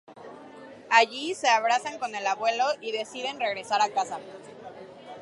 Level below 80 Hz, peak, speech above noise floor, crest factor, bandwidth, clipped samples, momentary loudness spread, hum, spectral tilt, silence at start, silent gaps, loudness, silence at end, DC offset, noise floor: -80 dBFS; -4 dBFS; 20 dB; 22 dB; 11.5 kHz; under 0.1%; 24 LU; none; -1.5 dB/octave; 0.1 s; none; -26 LUFS; 0 s; under 0.1%; -46 dBFS